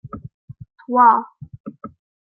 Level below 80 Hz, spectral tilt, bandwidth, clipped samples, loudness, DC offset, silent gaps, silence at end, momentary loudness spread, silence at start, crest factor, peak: -56 dBFS; -11 dB/octave; 3.2 kHz; under 0.1%; -15 LUFS; under 0.1%; 0.34-0.48 s, 1.60-1.64 s; 0.35 s; 24 LU; 0.05 s; 18 dB; -2 dBFS